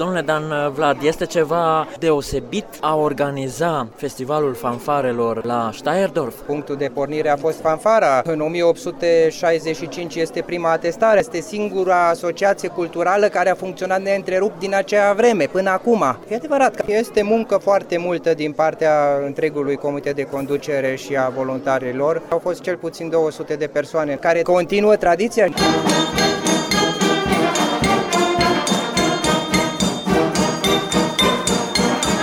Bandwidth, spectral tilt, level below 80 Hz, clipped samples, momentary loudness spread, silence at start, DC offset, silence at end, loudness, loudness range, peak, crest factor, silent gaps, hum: 18 kHz; -4 dB/octave; -46 dBFS; under 0.1%; 7 LU; 0 s; under 0.1%; 0 s; -19 LUFS; 4 LU; -4 dBFS; 14 dB; none; none